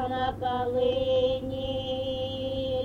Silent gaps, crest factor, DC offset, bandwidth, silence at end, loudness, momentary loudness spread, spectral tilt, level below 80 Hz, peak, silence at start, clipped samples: none; 12 dB; under 0.1%; 7 kHz; 0 s; -29 LUFS; 6 LU; -7 dB/octave; -46 dBFS; -16 dBFS; 0 s; under 0.1%